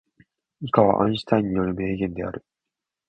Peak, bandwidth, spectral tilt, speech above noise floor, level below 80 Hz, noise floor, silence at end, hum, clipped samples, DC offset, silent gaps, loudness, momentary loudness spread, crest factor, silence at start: 0 dBFS; 8.8 kHz; -8.5 dB/octave; 64 dB; -50 dBFS; -86 dBFS; 0.7 s; none; under 0.1%; under 0.1%; none; -23 LUFS; 14 LU; 24 dB; 0.6 s